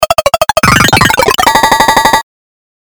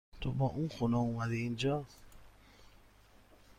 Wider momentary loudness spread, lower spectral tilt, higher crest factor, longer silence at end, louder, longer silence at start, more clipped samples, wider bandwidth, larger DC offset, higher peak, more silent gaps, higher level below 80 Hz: second, 4 LU vs 7 LU; second, -3 dB/octave vs -7 dB/octave; second, 8 dB vs 16 dB; first, 0.7 s vs 0.05 s; first, -7 LUFS vs -35 LUFS; second, 0 s vs 0.15 s; first, 2% vs under 0.1%; first, over 20 kHz vs 14.5 kHz; neither; first, 0 dBFS vs -22 dBFS; neither; first, -30 dBFS vs -56 dBFS